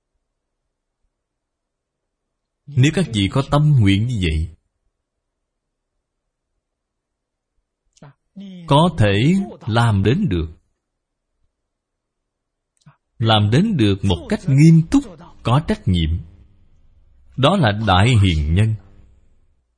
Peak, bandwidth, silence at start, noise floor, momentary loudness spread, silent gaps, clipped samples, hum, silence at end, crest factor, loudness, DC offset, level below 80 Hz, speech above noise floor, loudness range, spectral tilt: 0 dBFS; 10.5 kHz; 2.7 s; -78 dBFS; 12 LU; none; under 0.1%; none; 1 s; 18 dB; -17 LUFS; under 0.1%; -36 dBFS; 63 dB; 8 LU; -7 dB/octave